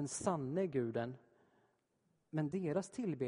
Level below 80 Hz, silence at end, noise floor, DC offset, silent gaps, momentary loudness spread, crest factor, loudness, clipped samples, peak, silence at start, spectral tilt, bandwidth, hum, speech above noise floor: -76 dBFS; 0 s; -80 dBFS; under 0.1%; none; 7 LU; 20 dB; -40 LUFS; under 0.1%; -20 dBFS; 0 s; -6.5 dB/octave; 10.5 kHz; none; 41 dB